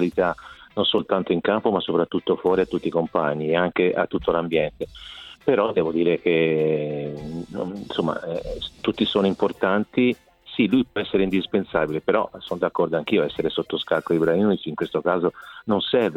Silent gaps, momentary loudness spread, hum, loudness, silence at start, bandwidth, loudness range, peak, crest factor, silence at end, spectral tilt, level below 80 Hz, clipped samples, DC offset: none; 10 LU; none; -23 LUFS; 0 s; 10 kHz; 2 LU; -4 dBFS; 18 dB; 0 s; -7.5 dB/octave; -52 dBFS; under 0.1%; under 0.1%